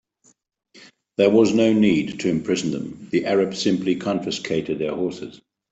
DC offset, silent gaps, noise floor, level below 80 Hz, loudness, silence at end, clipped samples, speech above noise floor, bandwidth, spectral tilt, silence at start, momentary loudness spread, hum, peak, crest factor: under 0.1%; none; -61 dBFS; -60 dBFS; -21 LUFS; 0.35 s; under 0.1%; 41 dB; 8.2 kHz; -5.5 dB/octave; 0.75 s; 11 LU; none; -4 dBFS; 18 dB